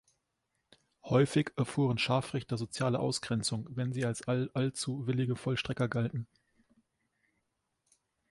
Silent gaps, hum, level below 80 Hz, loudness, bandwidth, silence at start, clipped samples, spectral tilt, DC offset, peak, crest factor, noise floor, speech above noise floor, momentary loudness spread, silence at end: none; none; -64 dBFS; -33 LUFS; 11.5 kHz; 1.05 s; under 0.1%; -5.5 dB/octave; under 0.1%; -14 dBFS; 20 dB; -82 dBFS; 50 dB; 7 LU; 2.05 s